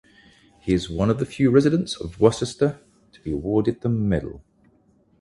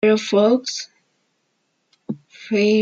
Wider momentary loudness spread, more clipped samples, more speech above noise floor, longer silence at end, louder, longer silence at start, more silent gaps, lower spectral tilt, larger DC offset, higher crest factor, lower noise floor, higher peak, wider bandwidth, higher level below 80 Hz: second, 13 LU vs 18 LU; neither; second, 39 dB vs 53 dB; first, 0.8 s vs 0 s; second, -22 LUFS vs -19 LUFS; first, 0.65 s vs 0.05 s; neither; first, -7 dB/octave vs -5 dB/octave; neither; first, 22 dB vs 16 dB; second, -60 dBFS vs -70 dBFS; about the same, -2 dBFS vs -4 dBFS; first, 11.5 kHz vs 7.8 kHz; first, -44 dBFS vs -70 dBFS